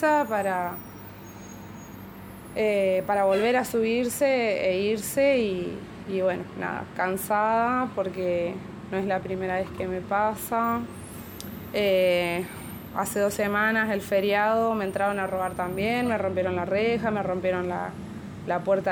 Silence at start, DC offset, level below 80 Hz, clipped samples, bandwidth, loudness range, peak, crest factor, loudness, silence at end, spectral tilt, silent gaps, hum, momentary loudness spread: 0 s; under 0.1%; -56 dBFS; under 0.1%; 19 kHz; 3 LU; -12 dBFS; 14 dB; -26 LUFS; 0 s; -5 dB/octave; none; none; 16 LU